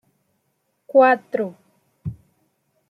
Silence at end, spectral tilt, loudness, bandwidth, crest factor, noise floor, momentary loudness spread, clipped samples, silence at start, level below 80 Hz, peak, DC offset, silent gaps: 0.75 s; -8 dB/octave; -19 LUFS; 5.2 kHz; 20 dB; -71 dBFS; 20 LU; under 0.1%; 0.95 s; -60 dBFS; -4 dBFS; under 0.1%; none